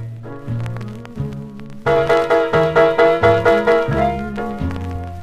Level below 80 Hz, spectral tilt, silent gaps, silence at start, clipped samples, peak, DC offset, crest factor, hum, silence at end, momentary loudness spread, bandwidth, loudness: -38 dBFS; -7 dB/octave; none; 0 s; under 0.1%; 0 dBFS; 0.2%; 16 dB; none; 0 s; 17 LU; 12 kHz; -16 LUFS